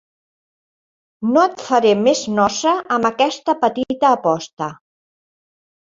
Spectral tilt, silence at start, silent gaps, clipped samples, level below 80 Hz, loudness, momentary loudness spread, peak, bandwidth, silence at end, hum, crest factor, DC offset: -4 dB/octave; 1.2 s; 4.53-4.57 s; under 0.1%; -60 dBFS; -17 LUFS; 8 LU; 0 dBFS; 7.8 kHz; 1.2 s; none; 18 dB; under 0.1%